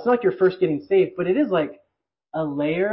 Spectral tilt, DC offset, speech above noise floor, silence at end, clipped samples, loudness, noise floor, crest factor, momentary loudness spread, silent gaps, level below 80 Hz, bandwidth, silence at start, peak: -11.5 dB/octave; under 0.1%; 56 dB; 0 s; under 0.1%; -22 LUFS; -77 dBFS; 12 dB; 8 LU; none; -62 dBFS; 5.8 kHz; 0 s; -8 dBFS